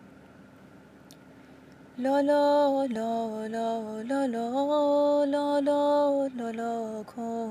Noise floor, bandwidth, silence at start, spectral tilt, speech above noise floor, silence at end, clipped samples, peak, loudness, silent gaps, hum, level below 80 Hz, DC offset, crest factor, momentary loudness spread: -52 dBFS; 15 kHz; 0 s; -5.5 dB/octave; 26 dB; 0 s; under 0.1%; -16 dBFS; -27 LUFS; none; none; -72 dBFS; under 0.1%; 12 dB; 10 LU